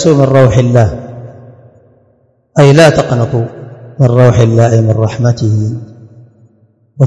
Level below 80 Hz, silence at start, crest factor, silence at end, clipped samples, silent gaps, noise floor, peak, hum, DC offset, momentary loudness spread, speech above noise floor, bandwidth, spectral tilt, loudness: -38 dBFS; 0 s; 10 dB; 0 s; 3%; none; -52 dBFS; 0 dBFS; none; under 0.1%; 18 LU; 45 dB; 11.5 kHz; -7 dB/octave; -9 LUFS